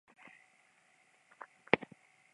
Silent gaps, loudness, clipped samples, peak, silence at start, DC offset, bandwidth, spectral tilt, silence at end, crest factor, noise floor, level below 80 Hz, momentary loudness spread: none; -34 LUFS; under 0.1%; -6 dBFS; 1.75 s; under 0.1%; 11 kHz; -6 dB/octave; 0.55 s; 36 dB; -69 dBFS; -80 dBFS; 24 LU